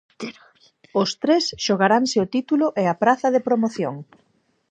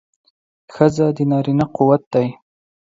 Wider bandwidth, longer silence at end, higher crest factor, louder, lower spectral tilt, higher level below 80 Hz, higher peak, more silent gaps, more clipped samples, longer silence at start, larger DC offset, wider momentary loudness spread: first, 9.2 kHz vs 7.8 kHz; about the same, 0.65 s vs 0.6 s; about the same, 20 dB vs 18 dB; second, -20 LUFS vs -17 LUFS; second, -4.5 dB/octave vs -8.5 dB/octave; second, -64 dBFS vs -54 dBFS; about the same, -2 dBFS vs 0 dBFS; second, none vs 2.06-2.11 s; neither; second, 0.2 s vs 0.7 s; neither; first, 14 LU vs 5 LU